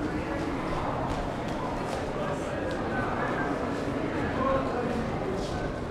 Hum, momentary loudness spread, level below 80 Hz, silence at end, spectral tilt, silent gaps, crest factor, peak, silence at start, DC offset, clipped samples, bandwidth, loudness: none; 4 LU; -42 dBFS; 0 s; -6.5 dB/octave; none; 16 dB; -14 dBFS; 0 s; under 0.1%; under 0.1%; 14 kHz; -30 LUFS